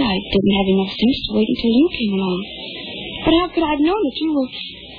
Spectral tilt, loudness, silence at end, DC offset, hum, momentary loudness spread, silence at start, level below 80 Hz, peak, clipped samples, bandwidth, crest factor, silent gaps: -8.5 dB/octave; -18 LUFS; 0 s; under 0.1%; none; 12 LU; 0 s; -40 dBFS; -4 dBFS; under 0.1%; 5.2 kHz; 14 dB; none